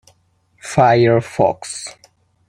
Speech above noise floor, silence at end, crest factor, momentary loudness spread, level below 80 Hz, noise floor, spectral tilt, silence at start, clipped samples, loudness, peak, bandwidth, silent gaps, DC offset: 44 dB; 0.6 s; 16 dB; 19 LU; -52 dBFS; -59 dBFS; -6 dB/octave; 0.65 s; under 0.1%; -15 LUFS; -2 dBFS; 12 kHz; none; under 0.1%